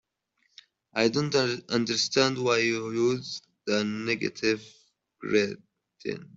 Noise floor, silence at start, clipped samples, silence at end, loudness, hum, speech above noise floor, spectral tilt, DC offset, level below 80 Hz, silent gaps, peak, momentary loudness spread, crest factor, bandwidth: -74 dBFS; 0.95 s; under 0.1%; 0.1 s; -27 LUFS; none; 47 dB; -4 dB/octave; under 0.1%; -68 dBFS; none; -6 dBFS; 13 LU; 22 dB; 8 kHz